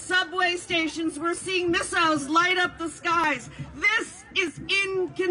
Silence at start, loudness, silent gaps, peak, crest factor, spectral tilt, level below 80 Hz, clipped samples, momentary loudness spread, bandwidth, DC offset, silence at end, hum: 0 s; -24 LUFS; none; -10 dBFS; 16 dB; -2.5 dB/octave; -56 dBFS; under 0.1%; 7 LU; 11 kHz; under 0.1%; 0 s; none